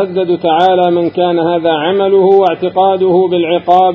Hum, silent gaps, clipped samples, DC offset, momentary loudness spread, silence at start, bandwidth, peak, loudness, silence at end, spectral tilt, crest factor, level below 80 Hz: none; none; 0.3%; under 0.1%; 4 LU; 0 s; 5.4 kHz; 0 dBFS; -11 LUFS; 0 s; -8 dB/octave; 10 dB; -52 dBFS